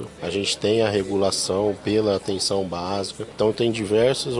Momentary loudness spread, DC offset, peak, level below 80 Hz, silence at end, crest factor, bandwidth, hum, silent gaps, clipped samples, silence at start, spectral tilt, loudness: 7 LU; under 0.1%; -6 dBFS; -54 dBFS; 0 s; 16 dB; 11.5 kHz; none; none; under 0.1%; 0 s; -4 dB/octave; -22 LUFS